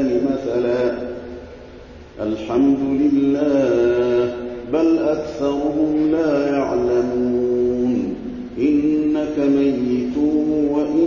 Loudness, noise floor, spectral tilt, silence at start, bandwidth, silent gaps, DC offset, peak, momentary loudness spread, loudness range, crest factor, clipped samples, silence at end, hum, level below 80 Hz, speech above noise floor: -19 LUFS; -39 dBFS; -7.5 dB/octave; 0 s; 7 kHz; none; under 0.1%; -8 dBFS; 10 LU; 2 LU; 12 dB; under 0.1%; 0 s; none; -44 dBFS; 21 dB